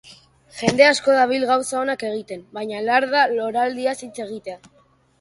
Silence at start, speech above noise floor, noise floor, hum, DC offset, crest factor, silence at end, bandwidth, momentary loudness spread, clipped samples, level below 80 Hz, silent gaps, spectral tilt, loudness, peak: 0.05 s; 29 dB; -49 dBFS; none; under 0.1%; 20 dB; 0.65 s; 11.5 kHz; 18 LU; under 0.1%; -62 dBFS; none; -3.5 dB/octave; -19 LUFS; 0 dBFS